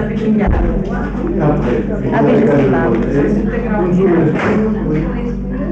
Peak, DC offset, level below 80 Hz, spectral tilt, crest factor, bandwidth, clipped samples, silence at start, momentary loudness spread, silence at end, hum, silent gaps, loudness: -2 dBFS; under 0.1%; -24 dBFS; -9.5 dB/octave; 12 dB; 7.6 kHz; under 0.1%; 0 s; 7 LU; 0 s; none; none; -14 LUFS